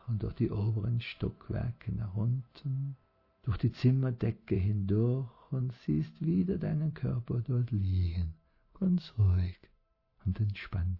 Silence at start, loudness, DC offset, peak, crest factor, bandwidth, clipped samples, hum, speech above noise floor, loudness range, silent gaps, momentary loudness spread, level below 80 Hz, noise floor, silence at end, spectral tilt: 0.05 s; -33 LUFS; under 0.1%; -16 dBFS; 16 dB; 6 kHz; under 0.1%; none; 38 dB; 3 LU; none; 9 LU; -52 dBFS; -69 dBFS; 0 s; -10.5 dB/octave